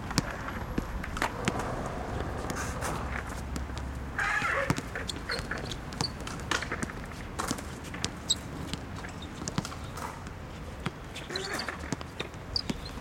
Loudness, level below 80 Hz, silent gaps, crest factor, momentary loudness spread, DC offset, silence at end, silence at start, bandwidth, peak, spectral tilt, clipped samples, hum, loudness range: -34 LUFS; -44 dBFS; none; 28 dB; 9 LU; under 0.1%; 0 s; 0 s; 17 kHz; -6 dBFS; -4 dB/octave; under 0.1%; none; 5 LU